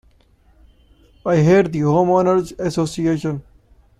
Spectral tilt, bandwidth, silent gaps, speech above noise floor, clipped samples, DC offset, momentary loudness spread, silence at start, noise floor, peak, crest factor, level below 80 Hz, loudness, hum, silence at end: -7.5 dB/octave; 12 kHz; none; 37 dB; under 0.1%; under 0.1%; 11 LU; 1.25 s; -54 dBFS; -4 dBFS; 16 dB; -48 dBFS; -17 LUFS; none; 0.6 s